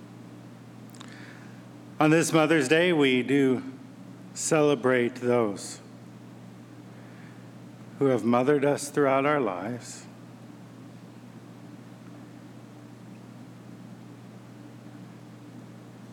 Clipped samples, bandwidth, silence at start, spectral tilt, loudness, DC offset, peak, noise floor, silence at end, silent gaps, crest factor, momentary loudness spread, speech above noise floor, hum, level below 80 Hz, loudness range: under 0.1%; 17 kHz; 0 s; -5 dB/octave; -24 LUFS; under 0.1%; -10 dBFS; -46 dBFS; 0 s; none; 20 dB; 24 LU; 22 dB; none; -80 dBFS; 22 LU